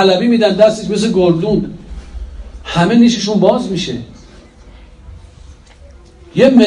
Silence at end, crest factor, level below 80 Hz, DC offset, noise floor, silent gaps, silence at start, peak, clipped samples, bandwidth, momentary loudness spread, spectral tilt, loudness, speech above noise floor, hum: 0 s; 14 dB; -36 dBFS; under 0.1%; -39 dBFS; none; 0 s; 0 dBFS; 0.4%; 10.5 kHz; 22 LU; -6 dB/octave; -13 LUFS; 28 dB; none